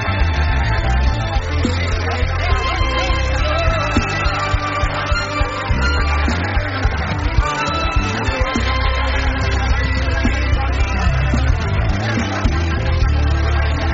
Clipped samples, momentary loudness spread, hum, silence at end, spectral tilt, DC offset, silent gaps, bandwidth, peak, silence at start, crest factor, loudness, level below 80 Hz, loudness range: under 0.1%; 2 LU; none; 0 s; -4.5 dB/octave; under 0.1%; none; 7.8 kHz; -2 dBFS; 0 s; 14 dB; -18 LUFS; -20 dBFS; 1 LU